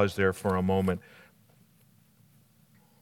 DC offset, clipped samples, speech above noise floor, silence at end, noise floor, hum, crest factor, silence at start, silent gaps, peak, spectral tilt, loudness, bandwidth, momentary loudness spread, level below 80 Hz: under 0.1%; under 0.1%; 35 dB; 2.05 s; -62 dBFS; none; 22 dB; 0 s; none; -10 dBFS; -7 dB/octave; -28 LUFS; 16 kHz; 6 LU; -68 dBFS